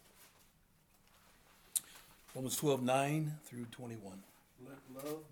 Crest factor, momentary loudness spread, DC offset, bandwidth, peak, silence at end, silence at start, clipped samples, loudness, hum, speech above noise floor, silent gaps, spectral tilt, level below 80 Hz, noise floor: 30 dB; 23 LU; under 0.1%; over 20 kHz; -12 dBFS; 0.05 s; 0.2 s; under 0.1%; -38 LUFS; none; 31 dB; none; -4.5 dB/octave; -74 dBFS; -70 dBFS